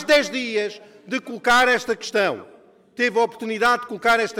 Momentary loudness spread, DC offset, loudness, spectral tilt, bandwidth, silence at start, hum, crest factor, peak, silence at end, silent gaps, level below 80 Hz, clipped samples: 13 LU; under 0.1%; -21 LUFS; -2.5 dB/octave; 18.5 kHz; 0 s; none; 14 dB; -8 dBFS; 0 s; none; -58 dBFS; under 0.1%